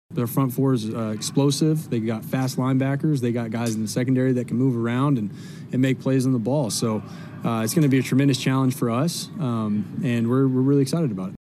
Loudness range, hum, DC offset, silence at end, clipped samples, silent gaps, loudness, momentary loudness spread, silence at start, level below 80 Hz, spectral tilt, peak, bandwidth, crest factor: 1 LU; none; under 0.1%; 0.05 s; under 0.1%; none; -23 LUFS; 7 LU; 0.1 s; -66 dBFS; -6.5 dB/octave; -8 dBFS; 14.5 kHz; 14 dB